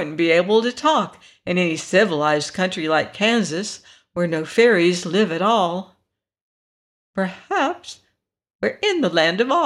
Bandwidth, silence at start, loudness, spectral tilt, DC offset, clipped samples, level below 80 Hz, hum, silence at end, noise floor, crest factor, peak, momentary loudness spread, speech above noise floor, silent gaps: 12 kHz; 0 s; -19 LUFS; -4.5 dB/octave; under 0.1%; under 0.1%; -66 dBFS; none; 0 s; -71 dBFS; 16 dB; -4 dBFS; 14 LU; 51 dB; 6.41-7.14 s, 8.50-8.59 s